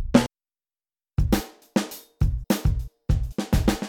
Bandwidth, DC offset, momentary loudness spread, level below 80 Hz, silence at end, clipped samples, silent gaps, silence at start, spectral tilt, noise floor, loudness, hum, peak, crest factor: 19 kHz; under 0.1%; 9 LU; -30 dBFS; 0 s; under 0.1%; none; 0 s; -6 dB/octave; under -90 dBFS; -26 LUFS; none; -2 dBFS; 22 dB